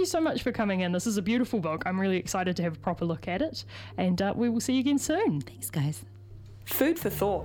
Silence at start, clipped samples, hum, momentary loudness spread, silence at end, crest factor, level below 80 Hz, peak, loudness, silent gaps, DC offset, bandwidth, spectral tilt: 0 s; under 0.1%; none; 8 LU; 0 s; 20 dB; -54 dBFS; -10 dBFS; -29 LUFS; none; under 0.1%; 19 kHz; -5.5 dB/octave